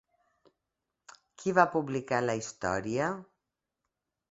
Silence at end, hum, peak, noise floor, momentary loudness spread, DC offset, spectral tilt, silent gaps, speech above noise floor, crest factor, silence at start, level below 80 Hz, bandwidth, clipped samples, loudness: 1.1 s; none; -8 dBFS; -86 dBFS; 9 LU; under 0.1%; -5.5 dB/octave; none; 57 dB; 26 dB; 1.1 s; -64 dBFS; 8.2 kHz; under 0.1%; -30 LUFS